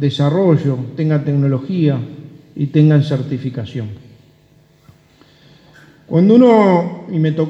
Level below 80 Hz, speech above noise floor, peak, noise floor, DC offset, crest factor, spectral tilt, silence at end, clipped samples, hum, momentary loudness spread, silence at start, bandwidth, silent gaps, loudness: -60 dBFS; 37 dB; 0 dBFS; -51 dBFS; under 0.1%; 16 dB; -9 dB/octave; 0 s; under 0.1%; none; 16 LU; 0 s; 7.6 kHz; none; -15 LUFS